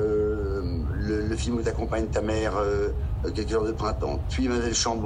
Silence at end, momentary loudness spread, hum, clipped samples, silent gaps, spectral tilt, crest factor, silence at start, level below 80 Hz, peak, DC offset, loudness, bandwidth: 0 s; 5 LU; none; under 0.1%; none; -5 dB/octave; 12 dB; 0 s; -32 dBFS; -12 dBFS; under 0.1%; -27 LUFS; 10.5 kHz